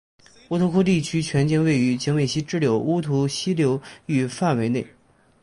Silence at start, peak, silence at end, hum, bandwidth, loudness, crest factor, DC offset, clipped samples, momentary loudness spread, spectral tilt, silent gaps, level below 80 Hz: 0.5 s; -8 dBFS; 0.55 s; none; 11.5 kHz; -22 LUFS; 14 dB; under 0.1%; under 0.1%; 6 LU; -6 dB/octave; none; -54 dBFS